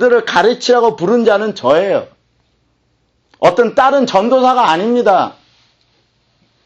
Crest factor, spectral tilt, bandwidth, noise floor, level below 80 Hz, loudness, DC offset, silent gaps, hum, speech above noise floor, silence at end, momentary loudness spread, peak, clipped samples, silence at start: 14 dB; -4.5 dB/octave; 8.2 kHz; -60 dBFS; -56 dBFS; -12 LUFS; under 0.1%; none; none; 49 dB; 1.35 s; 4 LU; 0 dBFS; under 0.1%; 0 s